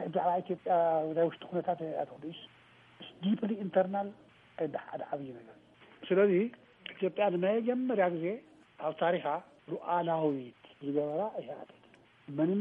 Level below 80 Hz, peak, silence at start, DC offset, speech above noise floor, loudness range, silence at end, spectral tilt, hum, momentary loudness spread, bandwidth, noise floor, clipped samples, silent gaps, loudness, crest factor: -82 dBFS; -14 dBFS; 0 s; under 0.1%; 29 dB; 4 LU; 0 s; -9.5 dB/octave; none; 17 LU; 4.3 kHz; -62 dBFS; under 0.1%; none; -33 LUFS; 18 dB